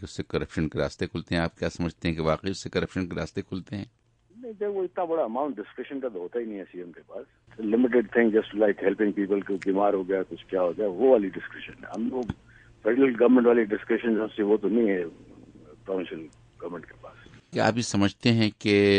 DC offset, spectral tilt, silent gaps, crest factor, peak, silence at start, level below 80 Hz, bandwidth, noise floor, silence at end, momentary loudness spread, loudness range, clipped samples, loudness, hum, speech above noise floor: under 0.1%; -6 dB/octave; none; 20 dB; -6 dBFS; 0 s; -54 dBFS; 9.8 kHz; -50 dBFS; 0 s; 17 LU; 8 LU; under 0.1%; -26 LUFS; none; 24 dB